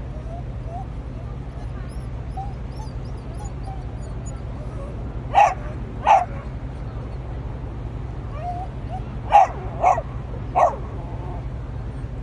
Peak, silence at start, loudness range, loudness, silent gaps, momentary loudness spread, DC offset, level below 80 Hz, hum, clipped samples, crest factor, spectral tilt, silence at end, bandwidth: -2 dBFS; 0 s; 10 LU; -25 LUFS; none; 15 LU; under 0.1%; -34 dBFS; none; under 0.1%; 22 dB; -6.5 dB/octave; 0 s; 11 kHz